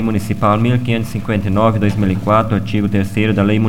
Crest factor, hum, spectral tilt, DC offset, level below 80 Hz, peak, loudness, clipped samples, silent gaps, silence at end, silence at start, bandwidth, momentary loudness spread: 14 dB; none; -7.5 dB/octave; 3%; -38 dBFS; 0 dBFS; -16 LUFS; under 0.1%; none; 0 s; 0 s; 15.5 kHz; 5 LU